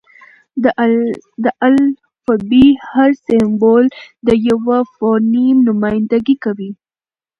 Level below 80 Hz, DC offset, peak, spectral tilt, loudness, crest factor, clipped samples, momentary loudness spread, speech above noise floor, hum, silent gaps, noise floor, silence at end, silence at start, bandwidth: -46 dBFS; under 0.1%; 0 dBFS; -7.5 dB/octave; -13 LUFS; 14 dB; under 0.1%; 9 LU; over 78 dB; none; none; under -90 dBFS; 0.65 s; 0.55 s; 6.4 kHz